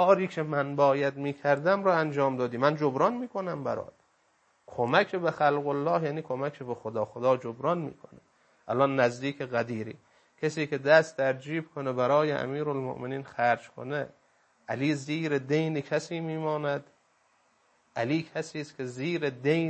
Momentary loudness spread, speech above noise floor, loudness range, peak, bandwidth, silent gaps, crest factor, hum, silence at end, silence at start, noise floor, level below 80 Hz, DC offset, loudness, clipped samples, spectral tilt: 11 LU; 41 dB; 5 LU; -8 dBFS; 8.6 kHz; none; 22 dB; none; 0 s; 0 s; -69 dBFS; -74 dBFS; under 0.1%; -29 LUFS; under 0.1%; -6.5 dB/octave